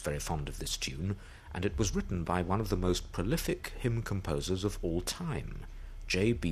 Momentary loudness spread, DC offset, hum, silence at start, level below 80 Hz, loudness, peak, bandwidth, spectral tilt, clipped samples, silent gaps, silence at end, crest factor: 8 LU; under 0.1%; none; 0 s; -42 dBFS; -34 LUFS; -16 dBFS; 15 kHz; -5 dB/octave; under 0.1%; none; 0 s; 18 dB